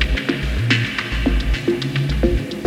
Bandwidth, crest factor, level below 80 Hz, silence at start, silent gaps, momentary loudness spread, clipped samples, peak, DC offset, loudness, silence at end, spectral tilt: 14 kHz; 16 dB; -24 dBFS; 0 s; none; 3 LU; under 0.1%; -4 dBFS; under 0.1%; -20 LUFS; 0 s; -6 dB/octave